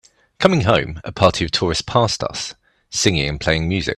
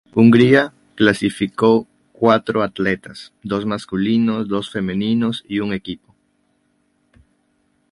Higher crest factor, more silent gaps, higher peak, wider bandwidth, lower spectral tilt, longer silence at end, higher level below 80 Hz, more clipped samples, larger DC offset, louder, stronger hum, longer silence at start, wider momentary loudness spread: about the same, 18 dB vs 18 dB; neither; about the same, 0 dBFS vs 0 dBFS; first, 13 kHz vs 11.5 kHz; second, -4.5 dB/octave vs -6.5 dB/octave; second, 0.05 s vs 1.95 s; first, -38 dBFS vs -52 dBFS; neither; neither; about the same, -18 LUFS vs -18 LUFS; neither; first, 0.4 s vs 0.15 s; second, 10 LU vs 14 LU